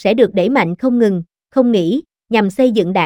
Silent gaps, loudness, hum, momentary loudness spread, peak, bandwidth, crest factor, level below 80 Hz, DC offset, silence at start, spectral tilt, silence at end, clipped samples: none; -15 LUFS; none; 6 LU; 0 dBFS; 13.5 kHz; 14 dB; -54 dBFS; under 0.1%; 0 s; -7 dB/octave; 0 s; under 0.1%